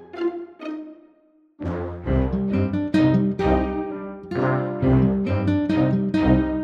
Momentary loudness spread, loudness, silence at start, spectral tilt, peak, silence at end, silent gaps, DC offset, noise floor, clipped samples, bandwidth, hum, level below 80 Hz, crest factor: 15 LU; -22 LUFS; 0 s; -9.5 dB/octave; -4 dBFS; 0 s; none; under 0.1%; -58 dBFS; under 0.1%; 7.4 kHz; none; -34 dBFS; 16 dB